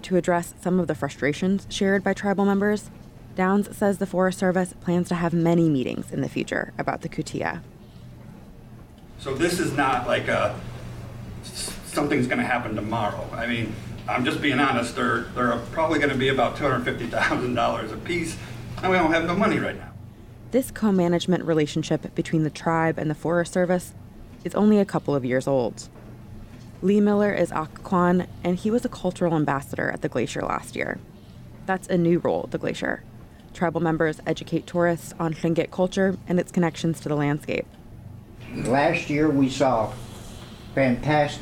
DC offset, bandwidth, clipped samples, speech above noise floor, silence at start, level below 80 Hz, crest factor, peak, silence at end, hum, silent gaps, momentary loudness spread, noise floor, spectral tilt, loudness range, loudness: under 0.1%; 16 kHz; under 0.1%; 21 dB; 0 s; -48 dBFS; 14 dB; -10 dBFS; 0 s; none; none; 16 LU; -44 dBFS; -6 dB/octave; 3 LU; -24 LUFS